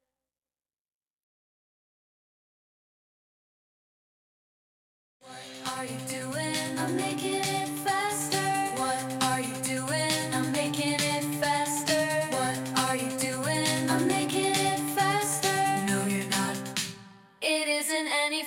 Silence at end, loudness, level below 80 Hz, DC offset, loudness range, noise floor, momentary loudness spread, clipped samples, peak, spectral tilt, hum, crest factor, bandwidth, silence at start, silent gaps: 0 s; -28 LUFS; -68 dBFS; under 0.1%; 8 LU; under -90 dBFS; 7 LU; under 0.1%; -8 dBFS; -3 dB/octave; none; 22 dB; 16.5 kHz; 5.25 s; none